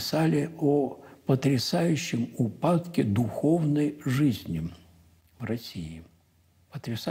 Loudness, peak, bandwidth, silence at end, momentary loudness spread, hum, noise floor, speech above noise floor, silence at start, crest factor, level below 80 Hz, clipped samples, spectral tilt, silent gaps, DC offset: -27 LUFS; -12 dBFS; 16 kHz; 0 s; 14 LU; none; -64 dBFS; 37 dB; 0 s; 16 dB; -58 dBFS; under 0.1%; -6.5 dB/octave; none; under 0.1%